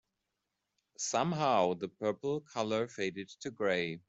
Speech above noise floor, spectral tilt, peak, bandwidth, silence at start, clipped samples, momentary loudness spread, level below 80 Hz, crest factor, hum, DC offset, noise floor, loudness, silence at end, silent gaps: 52 dB; -4.5 dB/octave; -16 dBFS; 8.2 kHz; 1 s; under 0.1%; 9 LU; -76 dBFS; 18 dB; none; under 0.1%; -86 dBFS; -34 LUFS; 0.1 s; none